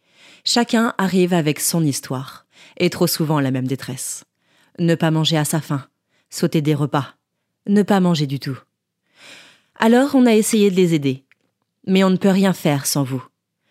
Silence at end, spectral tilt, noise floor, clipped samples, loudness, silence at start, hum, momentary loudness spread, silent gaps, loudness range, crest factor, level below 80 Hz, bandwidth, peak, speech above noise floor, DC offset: 0.45 s; -5 dB/octave; -70 dBFS; under 0.1%; -18 LUFS; 0.45 s; none; 14 LU; none; 5 LU; 20 dB; -68 dBFS; 16 kHz; 0 dBFS; 53 dB; under 0.1%